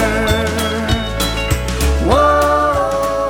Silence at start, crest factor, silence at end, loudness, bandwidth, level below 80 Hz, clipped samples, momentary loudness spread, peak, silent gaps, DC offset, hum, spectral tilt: 0 s; 14 dB; 0 s; -15 LUFS; 18 kHz; -22 dBFS; under 0.1%; 6 LU; 0 dBFS; none; under 0.1%; none; -4.5 dB/octave